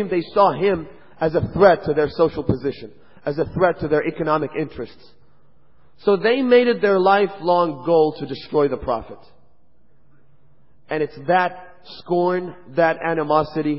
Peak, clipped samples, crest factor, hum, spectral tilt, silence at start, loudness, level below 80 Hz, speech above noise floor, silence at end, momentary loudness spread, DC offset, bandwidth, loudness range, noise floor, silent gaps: -2 dBFS; under 0.1%; 20 dB; none; -11 dB/octave; 0 s; -20 LUFS; -48 dBFS; 42 dB; 0 s; 13 LU; 0.6%; 5.8 kHz; 7 LU; -61 dBFS; none